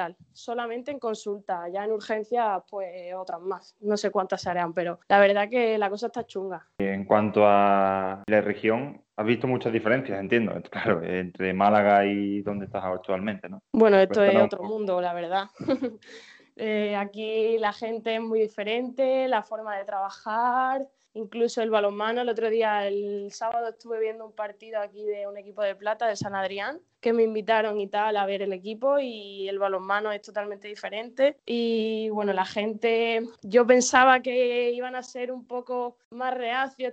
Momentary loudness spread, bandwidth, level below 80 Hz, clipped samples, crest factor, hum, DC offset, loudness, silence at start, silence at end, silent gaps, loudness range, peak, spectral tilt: 14 LU; 8.6 kHz; -70 dBFS; under 0.1%; 22 dB; none; under 0.1%; -26 LUFS; 0 s; 0 s; 36.05-36.11 s; 7 LU; -4 dBFS; -5 dB/octave